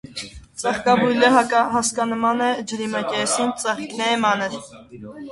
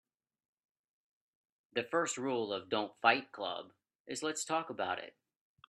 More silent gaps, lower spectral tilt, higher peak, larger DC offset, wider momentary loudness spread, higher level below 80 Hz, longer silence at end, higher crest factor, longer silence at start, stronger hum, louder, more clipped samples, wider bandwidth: second, none vs 3.95-4.05 s; about the same, -3 dB/octave vs -2.5 dB/octave; first, -2 dBFS vs -12 dBFS; neither; first, 19 LU vs 11 LU; first, -54 dBFS vs -86 dBFS; second, 0 s vs 0.6 s; second, 20 dB vs 26 dB; second, 0.05 s vs 1.75 s; neither; first, -20 LUFS vs -36 LUFS; neither; about the same, 11.5 kHz vs 12.5 kHz